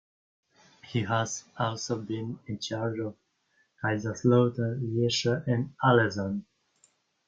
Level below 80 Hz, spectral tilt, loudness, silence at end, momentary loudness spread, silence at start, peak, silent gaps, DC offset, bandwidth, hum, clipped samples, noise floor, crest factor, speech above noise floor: -66 dBFS; -5.5 dB/octave; -29 LUFS; 0.85 s; 12 LU; 0.85 s; -8 dBFS; none; under 0.1%; 7.8 kHz; none; under 0.1%; -71 dBFS; 22 dB; 43 dB